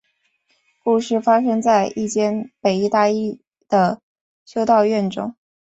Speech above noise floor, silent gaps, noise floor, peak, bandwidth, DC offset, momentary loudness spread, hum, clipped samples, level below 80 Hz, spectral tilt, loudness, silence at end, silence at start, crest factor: 49 dB; 4.03-4.15 s, 4.21-4.46 s; -66 dBFS; -2 dBFS; 8.2 kHz; under 0.1%; 12 LU; none; under 0.1%; -62 dBFS; -5.5 dB/octave; -19 LUFS; 0.45 s; 0.85 s; 16 dB